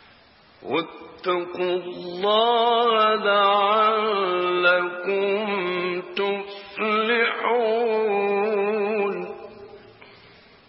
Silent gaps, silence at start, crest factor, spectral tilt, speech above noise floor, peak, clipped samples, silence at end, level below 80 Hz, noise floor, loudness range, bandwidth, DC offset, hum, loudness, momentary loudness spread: none; 0.6 s; 16 dB; -8.5 dB/octave; 32 dB; -6 dBFS; under 0.1%; 0.65 s; -72 dBFS; -53 dBFS; 4 LU; 5.8 kHz; under 0.1%; none; -22 LUFS; 12 LU